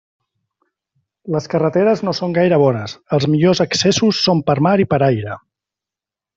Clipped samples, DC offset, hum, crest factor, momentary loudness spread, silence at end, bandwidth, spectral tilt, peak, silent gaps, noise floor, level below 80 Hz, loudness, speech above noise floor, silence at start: under 0.1%; under 0.1%; none; 14 dB; 9 LU; 1 s; 7.8 kHz; -5.5 dB/octave; -2 dBFS; none; -88 dBFS; -54 dBFS; -16 LUFS; 73 dB; 1.25 s